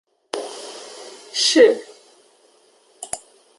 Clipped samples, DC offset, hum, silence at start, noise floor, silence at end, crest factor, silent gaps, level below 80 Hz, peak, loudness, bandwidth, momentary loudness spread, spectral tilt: under 0.1%; under 0.1%; none; 0.35 s; -56 dBFS; 0.4 s; 20 dB; none; -66 dBFS; -2 dBFS; -19 LUFS; 11.5 kHz; 24 LU; -0.5 dB/octave